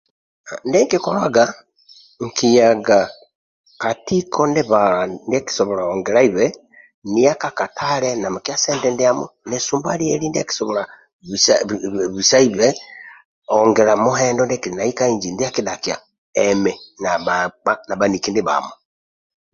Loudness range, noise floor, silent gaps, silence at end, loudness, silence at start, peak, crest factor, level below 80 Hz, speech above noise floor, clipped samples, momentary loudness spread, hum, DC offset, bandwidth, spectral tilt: 3 LU; -49 dBFS; 3.35-3.64 s, 6.94-7.02 s, 11.13-11.19 s, 13.25-13.42 s, 16.18-16.33 s; 0.8 s; -18 LUFS; 0.45 s; 0 dBFS; 18 dB; -56 dBFS; 31 dB; under 0.1%; 11 LU; none; under 0.1%; 7.8 kHz; -3.5 dB/octave